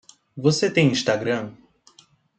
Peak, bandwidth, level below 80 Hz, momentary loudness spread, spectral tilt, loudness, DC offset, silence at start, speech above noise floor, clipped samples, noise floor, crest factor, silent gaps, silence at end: -4 dBFS; 9 kHz; -64 dBFS; 15 LU; -5 dB/octave; -21 LUFS; under 0.1%; 0.35 s; 36 dB; under 0.1%; -57 dBFS; 18 dB; none; 0.85 s